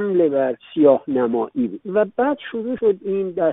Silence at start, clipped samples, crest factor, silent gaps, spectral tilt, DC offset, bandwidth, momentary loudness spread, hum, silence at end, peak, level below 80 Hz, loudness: 0 s; under 0.1%; 16 dB; none; -6 dB/octave; under 0.1%; 3.9 kHz; 8 LU; none; 0 s; -2 dBFS; -62 dBFS; -20 LUFS